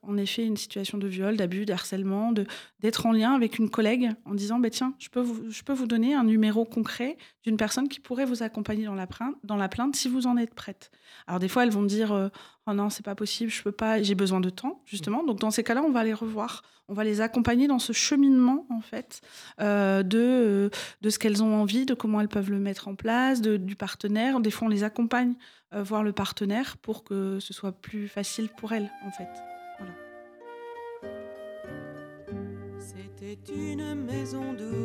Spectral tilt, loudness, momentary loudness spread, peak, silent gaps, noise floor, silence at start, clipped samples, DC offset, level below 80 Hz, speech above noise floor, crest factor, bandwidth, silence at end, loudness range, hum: -5 dB/octave; -27 LUFS; 17 LU; -12 dBFS; none; -47 dBFS; 0.05 s; under 0.1%; under 0.1%; -62 dBFS; 20 dB; 14 dB; 16 kHz; 0 s; 12 LU; none